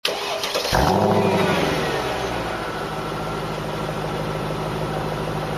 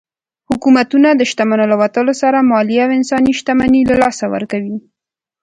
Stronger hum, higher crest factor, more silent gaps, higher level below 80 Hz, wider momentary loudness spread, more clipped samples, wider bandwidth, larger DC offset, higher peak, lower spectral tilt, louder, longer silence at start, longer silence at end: neither; about the same, 18 dB vs 14 dB; neither; first, -38 dBFS vs -46 dBFS; about the same, 9 LU vs 9 LU; neither; first, 14.5 kHz vs 9.4 kHz; neither; second, -4 dBFS vs 0 dBFS; about the same, -5 dB/octave vs -5 dB/octave; second, -23 LUFS vs -13 LUFS; second, 0.05 s vs 0.5 s; second, 0 s vs 0.65 s